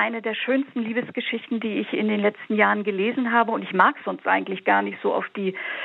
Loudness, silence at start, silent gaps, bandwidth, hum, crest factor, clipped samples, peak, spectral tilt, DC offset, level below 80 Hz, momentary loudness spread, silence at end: -23 LUFS; 0 s; none; 4.2 kHz; none; 20 dB; under 0.1%; -2 dBFS; -8 dB/octave; under 0.1%; -88 dBFS; 8 LU; 0 s